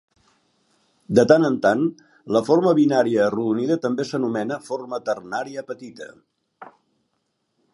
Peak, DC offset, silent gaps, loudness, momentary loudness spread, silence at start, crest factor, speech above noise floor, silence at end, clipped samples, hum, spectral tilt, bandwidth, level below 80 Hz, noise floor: 0 dBFS; under 0.1%; none; -21 LUFS; 17 LU; 1.1 s; 22 dB; 53 dB; 1.1 s; under 0.1%; none; -6.5 dB/octave; 11.5 kHz; -64 dBFS; -73 dBFS